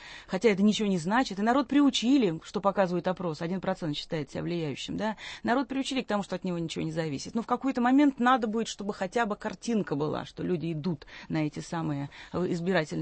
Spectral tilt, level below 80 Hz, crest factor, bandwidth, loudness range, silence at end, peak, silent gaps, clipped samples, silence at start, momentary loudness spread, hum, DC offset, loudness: -5.5 dB/octave; -60 dBFS; 18 dB; 8.8 kHz; 5 LU; 0 s; -10 dBFS; none; under 0.1%; 0 s; 10 LU; none; under 0.1%; -29 LUFS